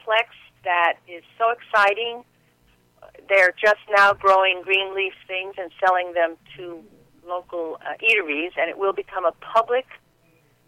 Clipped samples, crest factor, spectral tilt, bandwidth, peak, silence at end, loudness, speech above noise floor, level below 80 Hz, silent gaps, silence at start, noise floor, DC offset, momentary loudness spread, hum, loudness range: under 0.1%; 16 dB; -2.5 dB/octave; 15.5 kHz; -6 dBFS; 0.7 s; -21 LUFS; 38 dB; -64 dBFS; none; 0.05 s; -60 dBFS; under 0.1%; 16 LU; none; 5 LU